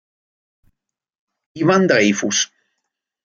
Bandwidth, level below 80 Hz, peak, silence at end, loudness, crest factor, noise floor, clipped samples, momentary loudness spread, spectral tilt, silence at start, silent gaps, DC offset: 7.6 kHz; -64 dBFS; -2 dBFS; 0.8 s; -16 LUFS; 18 dB; -78 dBFS; under 0.1%; 7 LU; -3.5 dB/octave; 1.55 s; none; under 0.1%